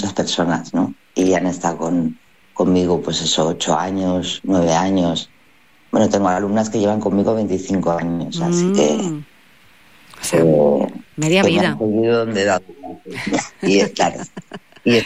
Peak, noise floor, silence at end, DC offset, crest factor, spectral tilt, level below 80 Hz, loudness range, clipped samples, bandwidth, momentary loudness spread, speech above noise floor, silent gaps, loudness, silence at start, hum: -4 dBFS; -53 dBFS; 0 s; 0.5%; 14 dB; -5 dB/octave; -54 dBFS; 2 LU; under 0.1%; 15.5 kHz; 10 LU; 36 dB; none; -18 LUFS; 0 s; none